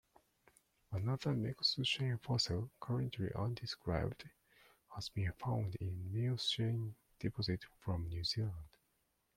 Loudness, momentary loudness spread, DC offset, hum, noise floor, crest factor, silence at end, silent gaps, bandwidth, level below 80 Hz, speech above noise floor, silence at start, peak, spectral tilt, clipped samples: -39 LUFS; 9 LU; under 0.1%; none; -81 dBFS; 18 dB; 0.7 s; none; 15 kHz; -60 dBFS; 42 dB; 0.9 s; -22 dBFS; -5.5 dB/octave; under 0.1%